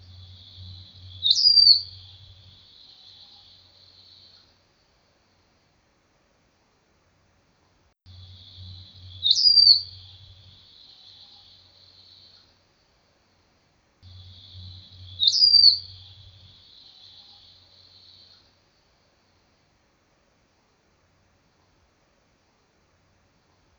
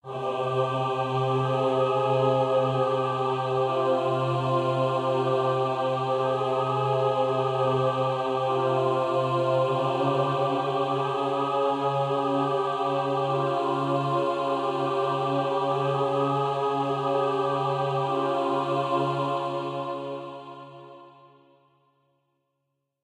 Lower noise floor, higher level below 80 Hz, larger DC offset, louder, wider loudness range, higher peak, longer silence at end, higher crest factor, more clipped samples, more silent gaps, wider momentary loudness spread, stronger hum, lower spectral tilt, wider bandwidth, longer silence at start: second, -65 dBFS vs -79 dBFS; about the same, -66 dBFS vs -70 dBFS; neither; first, -15 LUFS vs -26 LUFS; about the same, 4 LU vs 4 LU; first, -2 dBFS vs -12 dBFS; first, 7.95 s vs 1.95 s; first, 26 dB vs 14 dB; neither; neither; first, 32 LU vs 3 LU; neither; second, 0 dB/octave vs -7 dB/octave; second, 7.4 kHz vs 10.5 kHz; first, 0.6 s vs 0.05 s